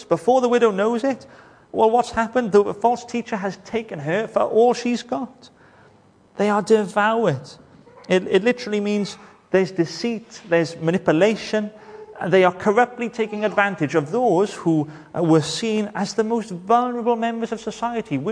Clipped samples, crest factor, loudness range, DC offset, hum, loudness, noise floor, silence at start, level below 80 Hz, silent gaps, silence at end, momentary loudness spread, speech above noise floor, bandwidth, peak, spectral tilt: under 0.1%; 18 dB; 3 LU; under 0.1%; none; -21 LUFS; -53 dBFS; 0 s; -60 dBFS; none; 0 s; 10 LU; 33 dB; 10.5 kHz; -2 dBFS; -5.5 dB/octave